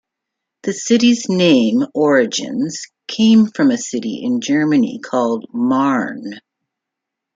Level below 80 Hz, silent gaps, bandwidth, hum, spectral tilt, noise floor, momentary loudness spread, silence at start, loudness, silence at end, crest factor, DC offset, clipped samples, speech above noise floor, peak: -62 dBFS; none; 7.8 kHz; none; -4.5 dB/octave; -81 dBFS; 12 LU; 0.65 s; -16 LUFS; 0.95 s; 16 dB; under 0.1%; under 0.1%; 66 dB; -2 dBFS